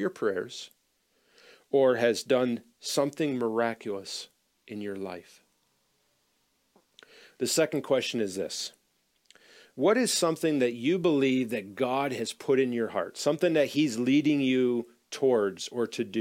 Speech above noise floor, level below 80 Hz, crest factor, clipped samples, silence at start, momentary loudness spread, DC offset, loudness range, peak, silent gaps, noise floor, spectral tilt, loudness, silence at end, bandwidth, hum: 45 dB; -78 dBFS; 18 dB; under 0.1%; 0 s; 14 LU; under 0.1%; 8 LU; -12 dBFS; none; -73 dBFS; -4.5 dB/octave; -28 LUFS; 0 s; 16.5 kHz; none